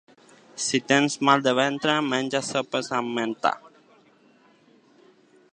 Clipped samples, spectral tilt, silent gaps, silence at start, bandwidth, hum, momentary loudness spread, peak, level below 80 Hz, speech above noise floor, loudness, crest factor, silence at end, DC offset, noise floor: under 0.1%; -3.5 dB/octave; none; 0.55 s; 10.5 kHz; none; 8 LU; -2 dBFS; -74 dBFS; 35 dB; -23 LUFS; 24 dB; 1.85 s; under 0.1%; -58 dBFS